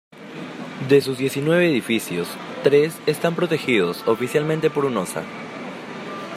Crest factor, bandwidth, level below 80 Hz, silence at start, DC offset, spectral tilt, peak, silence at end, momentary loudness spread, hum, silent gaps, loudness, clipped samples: 18 dB; 15.5 kHz; -66 dBFS; 0.15 s; under 0.1%; -5.5 dB/octave; -2 dBFS; 0 s; 15 LU; none; none; -21 LUFS; under 0.1%